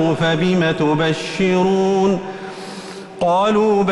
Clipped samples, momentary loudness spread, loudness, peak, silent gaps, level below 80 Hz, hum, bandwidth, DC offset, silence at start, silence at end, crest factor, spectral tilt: under 0.1%; 15 LU; -17 LUFS; -6 dBFS; none; -50 dBFS; none; 11.5 kHz; under 0.1%; 0 s; 0 s; 10 dB; -6 dB/octave